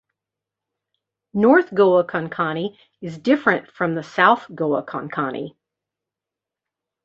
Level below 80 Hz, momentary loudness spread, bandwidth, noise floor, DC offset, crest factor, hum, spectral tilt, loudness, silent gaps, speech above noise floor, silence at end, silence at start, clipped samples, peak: -66 dBFS; 15 LU; 7.6 kHz; -87 dBFS; under 0.1%; 20 dB; none; -7 dB/octave; -20 LUFS; none; 68 dB; 1.55 s; 1.35 s; under 0.1%; -2 dBFS